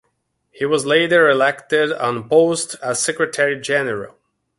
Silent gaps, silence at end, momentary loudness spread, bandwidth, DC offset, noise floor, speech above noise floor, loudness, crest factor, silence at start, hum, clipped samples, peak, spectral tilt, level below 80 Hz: none; 0.5 s; 10 LU; 11.5 kHz; under 0.1%; -69 dBFS; 52 dB; -17 LUFS; 18 dB; 0.6 s; none; under 0.1%; -2 dBFS; -3 dB/octave; -62 dBFS